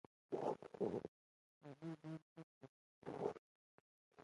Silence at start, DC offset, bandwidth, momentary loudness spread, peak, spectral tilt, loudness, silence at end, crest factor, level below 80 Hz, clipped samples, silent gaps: 0.3 s; under 0.1%; 11 kHz; 18 LU; -30 dBFS; -8 dB/octave; -49 LUFS; 0 s; 22 dB; -84 dBFS; under 0.1%; 1.08-1.61 s, 2.22-2.36 s, 2.43-2.61 s, 2.69-3.02 s, 3.39-4.11 s